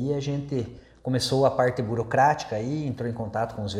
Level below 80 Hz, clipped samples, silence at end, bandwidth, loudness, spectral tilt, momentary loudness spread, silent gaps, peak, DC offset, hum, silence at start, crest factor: -54 dBFS; under 0.1%; 0 s; 14 kHz; -26 LUFS; -6 dB/octave; 10 LU; none; -8 dBFS; under 0.1%; none; 0 s; 18 dB